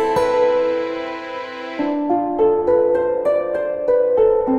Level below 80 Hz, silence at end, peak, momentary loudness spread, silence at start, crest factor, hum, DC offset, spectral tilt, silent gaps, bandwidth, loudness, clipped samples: -50 dBFS; 0 s; -4 dBFS; 11 LU; 0 s; 12 dB; none; under 0.1%; -6 dB/octave; none; 11.5 kHz; -18 LUFS; under 0.1%